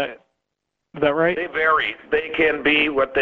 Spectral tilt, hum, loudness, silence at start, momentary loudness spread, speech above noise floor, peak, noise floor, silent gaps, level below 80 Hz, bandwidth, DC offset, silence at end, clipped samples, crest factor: -6.5 dB/octave; none; -19 LUFS; 0 s; 6 LU; 60 dB; -6 dBFS; -80 dBFS; none; -52 dBFS; 5.8 kHz; under 0.1%; 0 s; under 0.1%; 16 dB